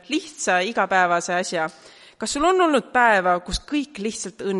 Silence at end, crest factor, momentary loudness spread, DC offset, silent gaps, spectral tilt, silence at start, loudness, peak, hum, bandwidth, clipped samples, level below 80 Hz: 0 s; 18 dB; 11 LU; under 0.1%; none; -3 dB/octave; 0.1 s; -21 LUFS; -4 dBFS; none; 11.5 kHz; under 0.1%; -46 dBFS